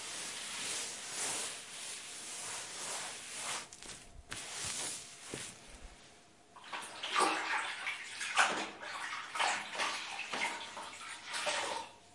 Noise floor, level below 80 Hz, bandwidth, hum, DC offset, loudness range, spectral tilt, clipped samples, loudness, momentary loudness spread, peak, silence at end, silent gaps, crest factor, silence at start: -61 dBFS; -68 dBFS; 11.5 kHz; none; under 0.1%; 7 LU; 0 dB/octave; under 0.1%; -38 LUFS; 14 LU; -14 dBFS; 0 s; none; 26 dB; 0 s